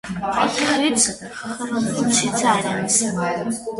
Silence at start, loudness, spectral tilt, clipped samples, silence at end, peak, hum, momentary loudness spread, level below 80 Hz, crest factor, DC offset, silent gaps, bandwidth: 0.05 s; -19 LUFS; -3 dB/octave; under 0.1%; 0 s; -4 dBFS; none; 8 LU; -54 dBFS; 18 dB; under 0.1%; none; 12 kHz